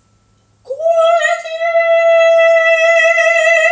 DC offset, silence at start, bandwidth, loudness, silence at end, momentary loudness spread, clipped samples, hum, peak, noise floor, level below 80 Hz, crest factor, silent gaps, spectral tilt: under 0.1%; 0.7 s; 8 kHz; -10 LUFS; 0 s; 7 LU; under 0.1%; none; 0 dBFS; -54 dBFS; -66 dBFS; 10 dB; none; 2 dB/octave